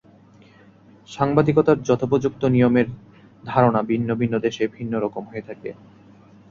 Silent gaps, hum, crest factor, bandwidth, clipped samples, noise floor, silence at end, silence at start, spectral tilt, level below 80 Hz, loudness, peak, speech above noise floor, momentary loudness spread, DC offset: none; none; 18 dB; 7.4 kHz; under 0.1%; -50 dBFS; 0.8 s; 1.1 s; -8 dB/octave; -54 dBFS; -20 LUFS; -2 dBFS; 30 dB; 18 LU; under 0.1%